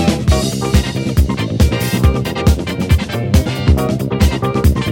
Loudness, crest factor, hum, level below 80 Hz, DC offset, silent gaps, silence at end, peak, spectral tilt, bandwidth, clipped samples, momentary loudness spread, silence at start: -15 LUFS; 14 dB; none; -18 dBFS; under 0.1%; none; 0 s; 0 dBFS; -6 dB/octave; 17 kHz; under 0.1%; 2 LU; 0 s